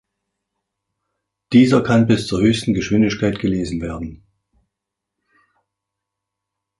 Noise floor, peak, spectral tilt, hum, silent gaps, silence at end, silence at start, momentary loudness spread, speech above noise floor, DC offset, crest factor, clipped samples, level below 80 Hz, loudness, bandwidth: -82 dBFS; -2 dBFS; -6.5 dB/octave; none; none; 2.65 s; 1.5 s; 13 LU; 66 dB; under 0.1%; 18 dB; under 0.1%; -44 dBFS; -17 LUFS; 11.5 kHz